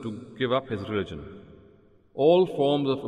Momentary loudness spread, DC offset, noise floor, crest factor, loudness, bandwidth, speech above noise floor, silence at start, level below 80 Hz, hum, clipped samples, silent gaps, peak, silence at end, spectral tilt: 20 LU; under 0.1%; -57 dBFS; 18 dB; -25 LUFS; 9.4 kHz; 32 dB; 0 s; -60 dBFS; none; under 0.1%; none; -8 dBFS; 0 s; -7.5 dB/octave